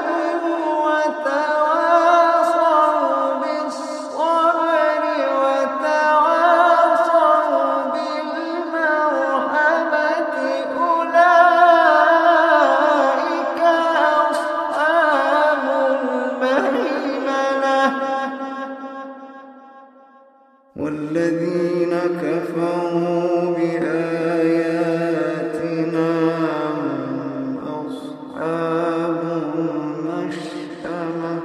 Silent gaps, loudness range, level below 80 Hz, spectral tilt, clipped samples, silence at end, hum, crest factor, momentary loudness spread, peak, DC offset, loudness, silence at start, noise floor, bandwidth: none; 9 LU; -70 dBFS; -5.5 dB/octave; under 0.1%; 0 s; none; 18 dB; 12 LU; 0 dBFS; under 0.1%; -18 LUFS; 0 s; -52 dBFS; 12 kHz